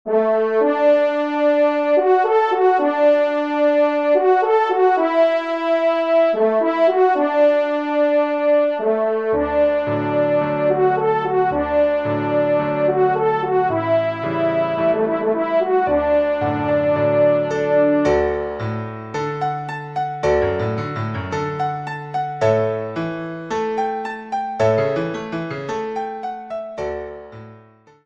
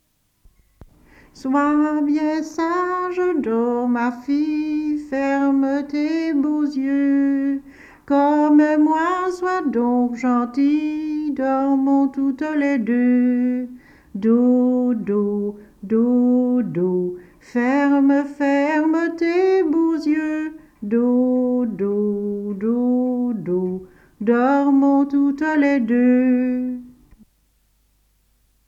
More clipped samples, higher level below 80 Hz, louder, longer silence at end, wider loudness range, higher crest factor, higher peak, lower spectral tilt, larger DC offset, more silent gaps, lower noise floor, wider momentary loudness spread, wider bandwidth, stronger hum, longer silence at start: neither; first, -48 dBFS vs -58 dBFS; about the same, -18 LUFS vs -19 LUFS; second, 0.45 s vs 1.75 s; first, 6 LU vs 3 LU; about the same, 14 dB vs 14 dB; about the same, -4 dBFS vs -6 dBFS; about the same, -7.5 dB/octave vs -7.5 dB/octave; neither; neither; second, -48 dBFS vs -62 dBFS; about the same, 10 LU vs 8 LU; about the same, 7.6 kHz vs 7.6 kHz; neither; second, 0.05 s vs 1.35 s